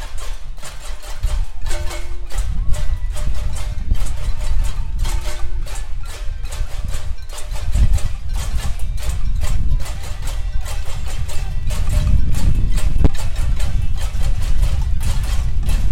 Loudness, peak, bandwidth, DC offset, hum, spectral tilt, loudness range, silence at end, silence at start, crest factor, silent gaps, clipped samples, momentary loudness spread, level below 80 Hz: -24 LUFS; -2 dBFS; 13 kHz; under 0.1%; none; -5 dB/octave; 6 LU; 0 s; 0 s; 12 dB; none; under 0.1%; 11 LU; -18 dBFS